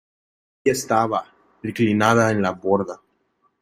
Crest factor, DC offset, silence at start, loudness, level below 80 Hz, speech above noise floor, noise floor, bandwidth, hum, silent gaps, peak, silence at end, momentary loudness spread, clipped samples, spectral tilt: 20 dB; under 0.1%; 0.65 s; -20 LUFS; -60 dBFS; 47 dB; -67 dBFS; 15.5 kHz; none; none; -2 dBFS; 0.65 s; 15 LU; under 0.1%; -5.5 dB/octave